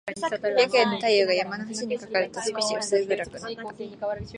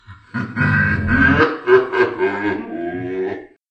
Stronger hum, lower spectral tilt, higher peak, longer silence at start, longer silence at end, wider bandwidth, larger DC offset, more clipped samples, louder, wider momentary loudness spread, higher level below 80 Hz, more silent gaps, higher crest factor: neither; second, -3 dB/octave vs -8 dB/octave; second, -6 dBFS vs 0 dBFS; about the same, 0.05 s vs 0.1 s; second, 0 s vs 0.25 s; first, 11 kHz vs 7 kHz; neither; neither; second, -25 LUFS vs -17 LUFS; about the same, 13 LU vs 13 LU; second, -58 dBFS vs -38 dBFS; neither; about the same, 20 dB vs 18 dB